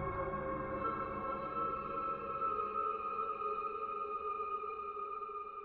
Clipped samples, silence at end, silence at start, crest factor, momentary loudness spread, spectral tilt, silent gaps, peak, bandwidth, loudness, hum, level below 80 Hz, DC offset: under 0.1%; 0 s; 0 s; 14 dB; 5 LU; -5.5 dB/octave; none; -26 dBFS; 4.7 kHz; -39 LUFS; none; -60 dBFS; under 0.1%